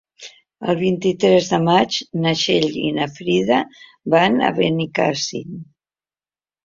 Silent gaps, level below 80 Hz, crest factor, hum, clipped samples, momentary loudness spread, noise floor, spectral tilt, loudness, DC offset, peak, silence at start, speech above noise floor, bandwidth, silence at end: none; -58 dBFS; 18 dB; none; under 0.1%; 12 LU; under -90 dBFS; -5 dB/octave; -18 LUFS; under 0.1%; -2 dBFS; 0.2 s; over 72 dB; 7.6 kHz; 1.05 s